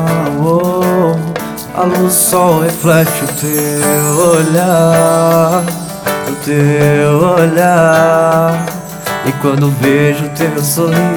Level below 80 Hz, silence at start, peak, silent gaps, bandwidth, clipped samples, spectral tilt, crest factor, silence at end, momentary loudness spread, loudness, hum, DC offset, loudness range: -46 dBFS; 0 s; 0 dBFS; none; over 20 kHz; under 0.1%; -5.5 dB/octave; 10 dB; 0 s; 8 LU; -11 LUFS; none; 0.1%; 1 LU